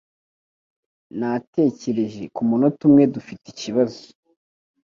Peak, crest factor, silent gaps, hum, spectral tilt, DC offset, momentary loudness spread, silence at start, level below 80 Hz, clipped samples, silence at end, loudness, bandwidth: -4 dBFS; 18 dB; 1.47-1.53 s; none; -7.5 dB/octave; under 0.1%; 18 LU; 1.15 s; -64 dBFS; under 0.1%; 0.85 s; -20 LUFS; 7.4 kHz